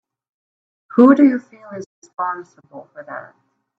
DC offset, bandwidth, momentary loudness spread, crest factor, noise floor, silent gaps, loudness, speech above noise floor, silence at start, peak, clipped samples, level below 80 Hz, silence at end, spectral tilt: under 0.1%; 7.4 kHz; 24 LU; 18 dB; under -90 dBFS; 1.86-2.02 s; -15 LUFS; over 73 dB; 0.95 s; 0 dBFS; under 0.1%; -68 dBFS; 0.6 s; -7.5 dB/octave